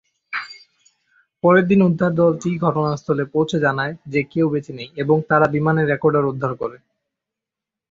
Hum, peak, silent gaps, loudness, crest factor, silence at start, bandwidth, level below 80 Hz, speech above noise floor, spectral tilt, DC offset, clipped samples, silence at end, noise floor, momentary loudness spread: none; -2 dBFS; none; -19 LUFS; 18 dB; 0.3 s; 7.6 kHz; -56 dBFS; 68 dB; -7.5 dB/octave; under 0.1%; under 0.1%; 1.15 s; -86 dBFS; 13 LU